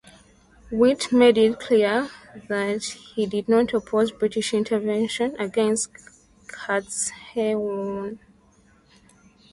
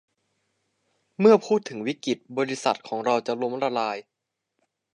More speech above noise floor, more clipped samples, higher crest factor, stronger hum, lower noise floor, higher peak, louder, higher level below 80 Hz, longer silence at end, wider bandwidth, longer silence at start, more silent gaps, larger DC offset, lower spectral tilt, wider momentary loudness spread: second, 35 dB vs 54 dB; neither; about the same, 20 dB vs 20 dB; neither; second, -57 dBFS vs -77 dBFS; about the same, -4 dBFS vs -6 dBFS; about the same, -23 LUFS vs -24 LUFS; first, -58 dBFS vs -80 dBFS; first, 1.35 s vs 0.95 s; about the same, 11.5 kHz vs 10.5 kHz; second, 0.7 s vs 1.2 s; neither; neither; about the same, -4 dB/octave vs -5 dB/octave; about the same, 13 LU vs 11 LU